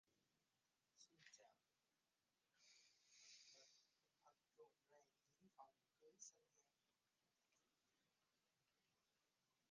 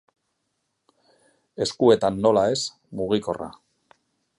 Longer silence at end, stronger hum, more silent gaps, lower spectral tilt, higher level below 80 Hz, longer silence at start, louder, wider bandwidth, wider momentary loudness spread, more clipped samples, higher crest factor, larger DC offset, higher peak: second, 0 s vs 0.85 s; neither; neither; second, -0.5 dB/octave vs -5 dB/octave; second, under -90 dBFS vs -58 dBFS; second, 0.05 s vs 1.6 s; second, -67 LUFS vs -22 LUFS; second, 9.4 kHz vs 11.5 kHz; second, 5 LU vs 14 LU; neither; first, 28 dB vs 20 dB; neither; second, -48 dBFS vs -4 dBFS